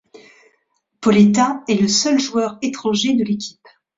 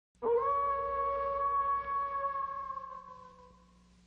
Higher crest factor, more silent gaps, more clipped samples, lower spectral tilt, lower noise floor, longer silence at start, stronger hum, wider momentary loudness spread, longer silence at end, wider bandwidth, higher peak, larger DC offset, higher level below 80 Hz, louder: about the same, 16 dB vs 14 dB; neither; neither; second, -4.5 dB/octave vs -6.5 dB/octave; first, -67 dBFS vs -62 dBFS; about the same, 0.15 s vs 0.2 s; neither; second, 10 LU vs 16 LU; about the same, 0.5 s vs 0.6 s; first, 7.8 kHz vs 5.8 kHz; first, -2 dBFS vs -22 dBFS; neither; about the same, -58 dBFS vs -60 dBFS; first, -17 LUFS vs -33 LUFS